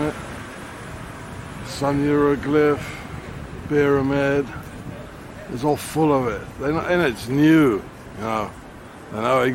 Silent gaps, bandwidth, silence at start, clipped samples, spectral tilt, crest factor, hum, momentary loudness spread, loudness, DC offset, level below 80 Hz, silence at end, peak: none; 16.5 kHz; 0 s; under 0.1%; -6.5 dB/octave; 16 dB; none; 17 LU; -21 LUFS; under 0.1%; -44 dBFS; 0 s; -6 dBFS